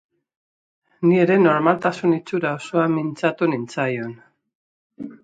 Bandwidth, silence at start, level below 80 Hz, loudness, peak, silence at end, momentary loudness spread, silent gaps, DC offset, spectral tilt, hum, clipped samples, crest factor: 9 kHz; 1 s; -68 dBFS; -20 LUFS; -2 dBFS; 0.1 s; 11 LU; 4.55-4.90 s; under 0.1%; -7.5 dB/octave; none; under 0.1%; 20 dB